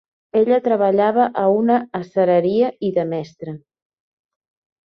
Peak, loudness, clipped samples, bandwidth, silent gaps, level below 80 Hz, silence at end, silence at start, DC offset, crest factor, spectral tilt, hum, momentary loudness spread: -4 dBFS; -18 LUFS; under 0.1%; 6.4 kHz; none; -66 dBFS; 1.25 s; 0.35 s; under 0.1%; 16 dB; -8.5 dB/octave; none; 14 LU